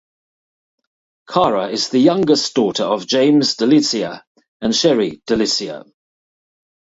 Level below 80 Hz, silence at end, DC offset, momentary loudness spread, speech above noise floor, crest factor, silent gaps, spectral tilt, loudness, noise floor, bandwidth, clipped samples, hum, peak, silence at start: -56 dBFS; 1.05 s; under 0.1%; 9 LU; over 74 dB; 18 dB; 4.27-4.35 s, 4.48-4.60 s; -4 dB/octave; -16 LUFS; under -90 dBFS; 8 kHz; under 0.1%; none; 0 dBFS; 1.3 s